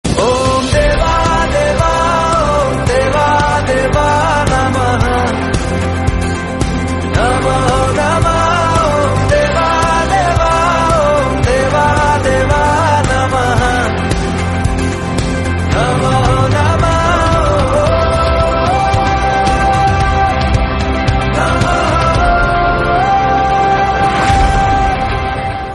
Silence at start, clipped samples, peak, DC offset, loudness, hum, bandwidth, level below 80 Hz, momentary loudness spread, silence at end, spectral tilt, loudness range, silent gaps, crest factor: 0.05 s; under 0.1%; 0 dBFS; under 0.1%; -12 LUFS; none; 11.5 kHz; -20 dBFS; 4 LU; 0 s; -5.5 dB/octave; 2 LU; none; 12 dB